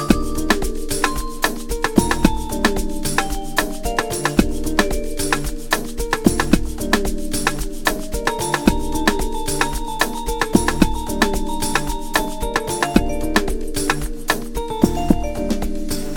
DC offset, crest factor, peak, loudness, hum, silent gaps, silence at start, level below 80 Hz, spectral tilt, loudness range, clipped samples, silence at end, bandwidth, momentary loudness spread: under 0.1%; 20 dB; 0 dBFS; -21 LUFS; none; none; 0 s; -26 dBFS; -4 dB/octave; 1 LU; under 0.1%; 0 s; 18.5 kHz; 5 LU